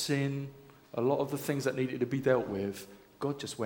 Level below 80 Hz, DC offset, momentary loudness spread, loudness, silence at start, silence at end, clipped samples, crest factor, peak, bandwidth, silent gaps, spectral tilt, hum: -66 dBFS; under 0.1%; 12 LU; -33 LUFS; 0 s; 0 s; under 0.1%; 20 dB; -14 dBFS; 19 kHz; none; -5.5 dB/octave; none